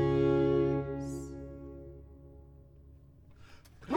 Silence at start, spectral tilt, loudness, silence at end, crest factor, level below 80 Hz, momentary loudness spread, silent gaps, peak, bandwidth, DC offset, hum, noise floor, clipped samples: 0 s; -8.5 dB/octave; -31 LUFS; 0 s; 16 dB; -52 dBFS; 26 LU; none; -18 dBFS; 11 kHz; under 0.1%; none; -56 dBFS; under 0.1%